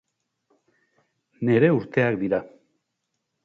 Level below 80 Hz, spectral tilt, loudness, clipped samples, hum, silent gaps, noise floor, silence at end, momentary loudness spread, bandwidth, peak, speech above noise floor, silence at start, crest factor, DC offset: -64 dBFS; -9.5 dB/octave; -22 LUFS; under 0.1%; none; none; -79 dBFS; 1 s; 9 LU; 6.6 kHz; -4 dBFS; 58 dB; 1.4 s; 20 dB; under 0.1%